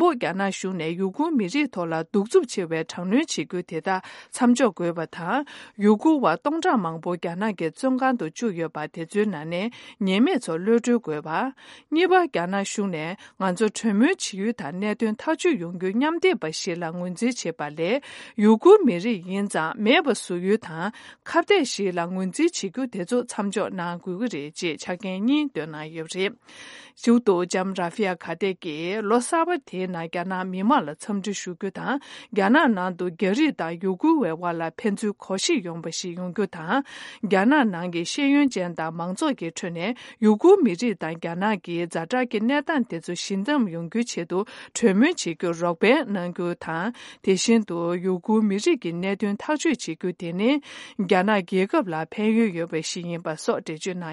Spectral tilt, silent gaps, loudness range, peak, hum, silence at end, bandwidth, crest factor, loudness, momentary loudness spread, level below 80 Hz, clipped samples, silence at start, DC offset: -5 dB/octave; none; 4 LU; -4 dBFS; none; 0 s; 11.5 kHz; 20 dB; -24 LUFS; 10 LU; -74 dBFS; under 0.1%; 0 s; under 0.1%